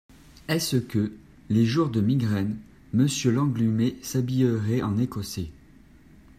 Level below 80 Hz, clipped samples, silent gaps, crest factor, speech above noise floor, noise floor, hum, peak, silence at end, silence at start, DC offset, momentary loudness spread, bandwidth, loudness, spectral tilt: -54 dBFS; under 0.1%; none; 16 dB; 28 dB; -52 dBFS; none; -10 dBFS; 0.85 s; 0.5 s; under 0.1%; 10 LU; 15.5 kHz; -25 LUFS; -6 dB/octave